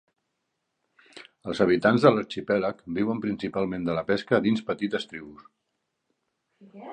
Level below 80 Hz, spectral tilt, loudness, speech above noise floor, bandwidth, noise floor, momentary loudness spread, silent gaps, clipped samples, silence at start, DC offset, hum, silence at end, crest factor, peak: -62 dBFS; -7 dB/octave; -25 LUFS; 54 dB; 9.6 kHz; -79 dBFS; 14 LU; none; under 0.1%; 1.15 s; under 0.1%; none; 0 s; 24 dB; -4 dBFS